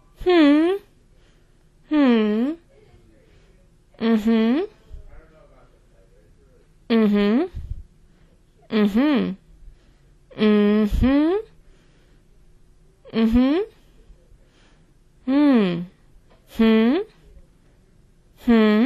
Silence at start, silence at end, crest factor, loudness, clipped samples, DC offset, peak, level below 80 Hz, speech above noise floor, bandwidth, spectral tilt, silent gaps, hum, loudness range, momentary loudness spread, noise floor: 0.2 s; 0 s; 18 dB; -20 LUFS; under 0.1%; under 0.1%; -4 dBFS; -40 dBFS; 37 dB; 12.5 kHz; -8 dB/octave; none; none; 4 LU; 17 LU; -55 dBFS